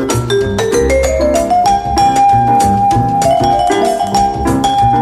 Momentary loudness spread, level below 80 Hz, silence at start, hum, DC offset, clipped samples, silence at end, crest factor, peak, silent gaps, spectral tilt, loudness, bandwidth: 4 LU; -26 dBFS; 0 s; none; under 0.1%; under 0.1%; 0 s; 10 dB; 0 dBFS; none; -5 dB/octave; -11 LUFS; 15 kHz